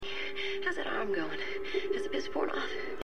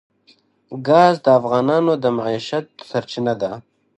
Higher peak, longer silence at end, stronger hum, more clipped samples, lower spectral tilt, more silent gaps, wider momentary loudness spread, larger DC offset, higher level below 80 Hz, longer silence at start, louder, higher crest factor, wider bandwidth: second, -18 dBFS vs 0 dBFS; second, 0 s vs 0.35 s; neither; neither; second, -4 dB/octave vs -6.5 dB/octave; neither; second, 3 LU vs 14 LU; first, 1% vs under 0.1%; first, -58 dBFS vs -64 dBFS; second, 0 s vs 0.7 s; second, -34 LUFS vs -18 LUFS; about the same, 16 dB vs 18 dB; first, 10.5 kHz vs 9 kHz